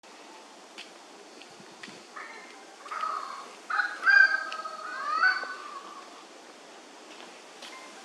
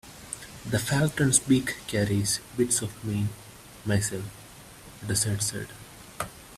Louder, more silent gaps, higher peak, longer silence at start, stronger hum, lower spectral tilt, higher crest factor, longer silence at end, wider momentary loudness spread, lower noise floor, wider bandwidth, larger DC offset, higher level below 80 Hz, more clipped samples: about the same, -26 LUFS vs -27 LUFS; neither; about the same, -8 dBFS vs -6 dBFS; about the same, 0.05 s vs 0.05 s; neither; second, 0 dB/octave vs -4 dB/octave; about the same, 24 dB vs 22 dB; about the same, 0 s vs 0 s; first, 26 LU vs 23 LU; about the same, -49 dBFS vs -47 dBFS; second, 12.5 kHz vs 16 kHz; neither; second, under -90 dBFS vs -54 dBFS; neither